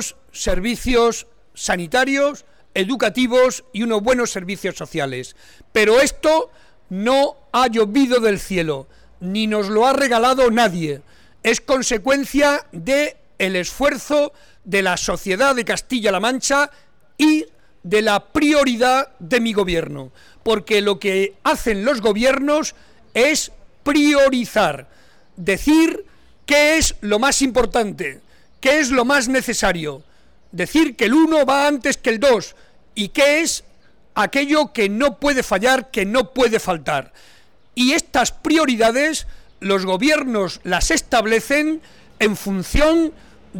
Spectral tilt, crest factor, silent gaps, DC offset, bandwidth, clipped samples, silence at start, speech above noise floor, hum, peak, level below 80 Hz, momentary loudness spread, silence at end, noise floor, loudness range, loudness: -3.5 dB/octave; 14 dB; none; 0.4%; 19 kHz; under 0.1%; 0 s; 29 dB; none; -4 dBFS; -38 dBFS; 11 LU; 0 s; -46 dBFS; 2 LU; -18 LUFS